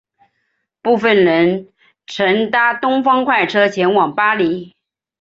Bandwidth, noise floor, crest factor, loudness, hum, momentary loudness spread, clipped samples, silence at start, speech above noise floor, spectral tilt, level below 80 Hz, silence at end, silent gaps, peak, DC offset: 7.8 kHz; -69 dBFS; 14 dB; -14 LUFS; none; 8 LU; under 0.1%; 0.85 s; 55 dB; -6 dB/octave; -60 dBFS; 0.55 s; none; -2 dBFS; under 0.1%